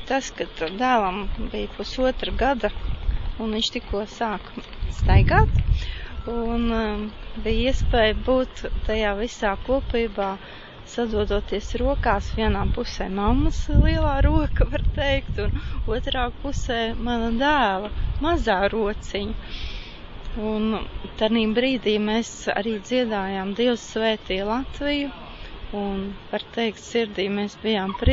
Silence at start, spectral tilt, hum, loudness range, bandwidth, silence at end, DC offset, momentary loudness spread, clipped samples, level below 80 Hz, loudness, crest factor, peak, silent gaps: 0 s; -6 dB/octave; none; 3 LU; 7.8 kHz; 0 s; under 0.1%; 11 LU; under 0.1%; -28 dBFS; -24 LUFS; 20 dB; -2 dBFS; none